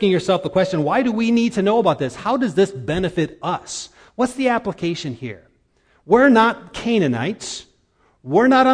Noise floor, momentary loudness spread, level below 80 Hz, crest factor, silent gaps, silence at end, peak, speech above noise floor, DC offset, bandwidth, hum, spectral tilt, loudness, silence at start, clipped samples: -60 dBFS; 15 LU; -50 dBFS; 18 dB; none; 0 s; -2 dBFS; 42 dB; under 0.1%; 10.5 kHz; none; -5.5 dB/octave; -19 LUFS; 0 s; under 0.1%